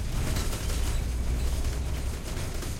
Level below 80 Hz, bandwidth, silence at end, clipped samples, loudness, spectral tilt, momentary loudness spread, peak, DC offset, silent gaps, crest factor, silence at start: -30 dBFS; 16.5 kHz; 0 s; under 0.1%; -32 LUFS; -4.5 dB/octave; 4 LU; -16 dBFS; under 0.1%; none; 12 dB; 0 s